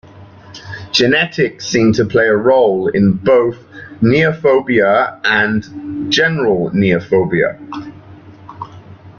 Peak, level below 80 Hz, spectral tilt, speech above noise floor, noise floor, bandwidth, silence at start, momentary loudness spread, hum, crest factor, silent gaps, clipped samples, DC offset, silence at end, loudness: 0 dBFS; -48 dBFS; -5.5 dB/octave; 25 dB; -38 dBFS; 7.4 kHz; 0.15 s; 19 LU; none; 14 dB; none; under 0.1%; under 0.1%; 0.1 s; -13 LUFS